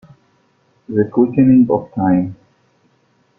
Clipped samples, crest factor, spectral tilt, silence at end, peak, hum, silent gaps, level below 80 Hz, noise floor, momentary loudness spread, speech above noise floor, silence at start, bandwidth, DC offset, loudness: under 0.1%; 14 dB; -12.5 dB/octave; 1.05 s; -2 dBFS; none; none; -50 dBFS; -59 dBFS; 9 LU; 45 dB; 0.9 s; 2.8 kHz; under 0.1%; -15 LUFS